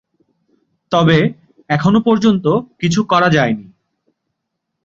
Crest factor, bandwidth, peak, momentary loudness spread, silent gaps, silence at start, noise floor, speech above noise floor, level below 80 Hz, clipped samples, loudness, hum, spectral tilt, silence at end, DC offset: 16 dB; 7.6 kHz; 0 dBFS; 7 LU; none; 0.9 s; -75 dBFS; 62 dB; -52 dBFS; under 0.1%; -14 LUFS; none; -6.5 dB/octave; 1.25 s; under 0.1%